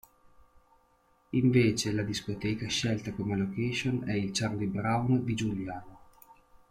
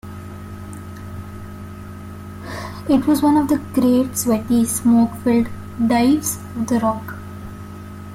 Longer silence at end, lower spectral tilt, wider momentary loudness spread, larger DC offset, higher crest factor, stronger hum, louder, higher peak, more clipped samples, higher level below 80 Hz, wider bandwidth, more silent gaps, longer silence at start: first, 0.75 s vs 0 s; about the same, -5.5 dB/octave vs -5.5 dB/octave; second, 8 LU vs 19 LU; neither; first, 20 dB vs 14 dB; neither; second, -30 LUFS vs -18 LUFS; second, -12 dBFS vs -6 dBFS; neither; second, -56 dBFS vs -46 dBFS; about the same, 15.5 kHz vs 16.5 kHz; neither; first, 1.35 s vs 0.05 s